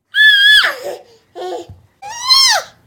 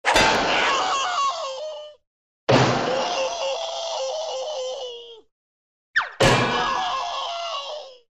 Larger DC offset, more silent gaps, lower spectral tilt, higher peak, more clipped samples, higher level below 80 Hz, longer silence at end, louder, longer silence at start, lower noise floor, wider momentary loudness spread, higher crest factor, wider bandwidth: neither; second, none vs 2.07-2.47 s, 5.32-5.94 s; second, 1.5 dB/octave vs -3.5 dB/octave; first, 0 dBFS vs -4 dBFS; neither; second, -56 dBFS vs -46 dBFS; about the same, 0.2 s vs 0.2 s; first, -8 LUFS vs -22 LUFS; about the same, 0.15 s vs 0.05 s; second, -34 dBFS vs under -90 dBFS; first, 23 LU vs 15 LU; second, 14 dB vs 20 dB; first, 17.5 kHz vs 14.5 kHz